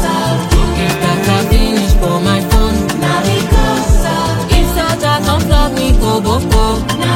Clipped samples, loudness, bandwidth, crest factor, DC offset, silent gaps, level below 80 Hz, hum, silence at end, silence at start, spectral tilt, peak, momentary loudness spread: under 0.1%; -13 LUFS; 17 kHz; 12 dB; under 0.1%; none; -16 dBFS; none; 0 s; 0 s; -5 dB/octave; 0 dBFS; 2 LU